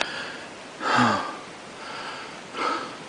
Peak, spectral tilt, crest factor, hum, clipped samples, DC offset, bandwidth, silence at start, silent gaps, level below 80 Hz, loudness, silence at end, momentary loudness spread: -4 dBFS; -3.5 dB/octave; 24 dB; none; under 0.1%; under 0.1%; 10.5 kHz; 0 s; none; -66 dBFS; -27 LUFS; 0 s; 17 LU